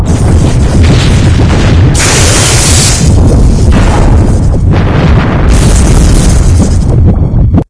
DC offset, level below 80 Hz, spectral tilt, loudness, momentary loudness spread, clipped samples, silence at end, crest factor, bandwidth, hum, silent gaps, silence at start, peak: 0.8%; -8 dBFS; -5 dB/octave; -6 LUFS; 3 LU; 8%; 0.05 s; 4 dB; 11 kHz; none; none; 0 s; 0 dBFS